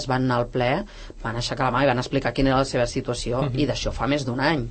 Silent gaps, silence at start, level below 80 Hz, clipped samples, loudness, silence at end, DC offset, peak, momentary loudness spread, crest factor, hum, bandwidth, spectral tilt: none; 0 s; -38 dBFS; under 0.1%; -24 LUFS; 0 s; under 0.1%; -6 dBFS; 7 LU; 18 dB; none; 8.8 kHz; -5.5 dB/octave